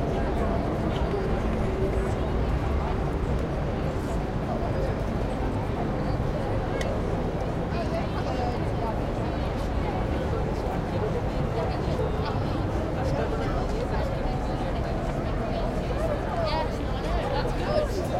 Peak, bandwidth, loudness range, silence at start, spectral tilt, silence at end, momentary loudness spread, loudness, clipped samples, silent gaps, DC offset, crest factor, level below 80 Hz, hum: -10 dBFS; 13.5 kHz; 1 LU; 0 s; -7.5 dB/octave; 0 s; 2 LU; -28 LUFS; under 0.1%; none; under 0.1%; 16 dB; -32 dBFS; none